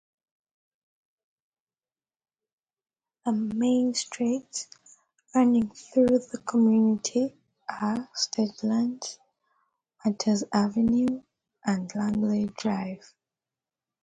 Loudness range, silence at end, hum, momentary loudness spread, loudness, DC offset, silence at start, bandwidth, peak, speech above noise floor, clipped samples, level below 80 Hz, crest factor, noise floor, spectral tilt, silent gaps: 5 LU; 1.1 s; none; 13 LU; -26 LUFS; under 0.1%; 3.25 s; 9.4 kHz; -10 dBFS; over 65 dB; under 0.1%; -64 dBFS; 18 dB; under -90 dBFS; -5 dB/octave; none